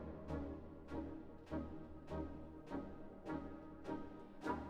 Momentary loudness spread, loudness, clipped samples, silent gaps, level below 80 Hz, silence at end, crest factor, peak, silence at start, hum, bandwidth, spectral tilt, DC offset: 6 LU; -50 LUFS; under 0.1%; none; -60 dBFS; 0 s; 20 dB; -28 dBFS; 0 s; none; 11.5 kHz; -8 dB/octave; under 0.1%